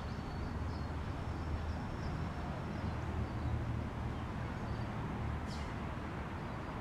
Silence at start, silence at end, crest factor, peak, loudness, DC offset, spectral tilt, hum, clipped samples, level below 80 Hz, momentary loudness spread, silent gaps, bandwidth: 0 s; 0 s; 14 dB; -26 dBFS; -41 LUFS; under 0.1%; -7.5 dB/octave; none; under 0.1%; -46 dBFS; 3 LU; none; 11.5 kHz